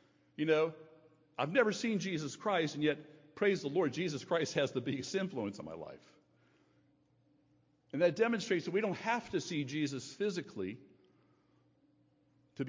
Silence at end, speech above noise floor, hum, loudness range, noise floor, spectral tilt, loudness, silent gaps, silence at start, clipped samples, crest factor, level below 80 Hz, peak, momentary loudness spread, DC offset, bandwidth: 0 s; 37 dB; none; 6 LU; -72 dBFS; -5 dB/octave; -35 LUFS; none; 0.4 s; under 0.1%; 20 dB; -76 dBFS; -16 dBFS; 13 LU; under 0.1%; 7.6 kHz